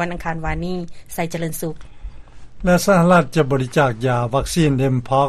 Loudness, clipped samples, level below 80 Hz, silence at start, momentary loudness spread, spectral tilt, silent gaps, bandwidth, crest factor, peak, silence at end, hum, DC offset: -18 LUFS; under 0.1%; -36 dBFS; 0 s; 14 LU; -6 dB/octave; none; 13.5 kHz; 18 dB; 0 dBFS; 0 s; none; under 0.1%